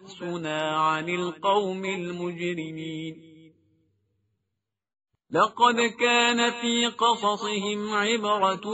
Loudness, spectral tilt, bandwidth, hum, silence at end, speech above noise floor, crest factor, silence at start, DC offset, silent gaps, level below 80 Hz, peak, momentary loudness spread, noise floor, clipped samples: -25 LUFS; -2 dB/octave; 8 kHz; none; 0 s; 59 dB; 20 dB; 0 s; under 0.1%; none; -72 dBFS; -6 dBFS; 12 LU; -84 dBFS; under 0.1%